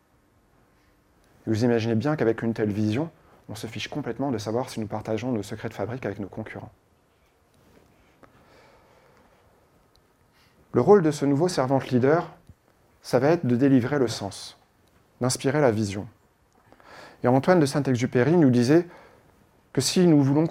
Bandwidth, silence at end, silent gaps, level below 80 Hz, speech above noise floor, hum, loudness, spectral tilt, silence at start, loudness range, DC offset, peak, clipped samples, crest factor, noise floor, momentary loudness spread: 16 kHz; 0 s; none; -62 dBFS; 40 dB; none; -24 LUFS; -6 dB/octave; 1.45 s; 11 LU; under 0.1%; -4 dBFS; under 0.1%; 20 dB; -63 dBFS; 17 LU